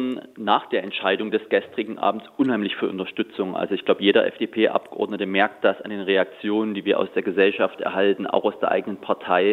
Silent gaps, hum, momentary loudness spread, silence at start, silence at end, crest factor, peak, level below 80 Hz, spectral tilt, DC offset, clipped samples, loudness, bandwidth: none; none; 7 LU; 0 s; 0 s; 20 dB; -2 dBFS; -76 dBFS; -7 dB/octave; under 0.1%; under 0.1%; -23 LUFS; 4.4 kHz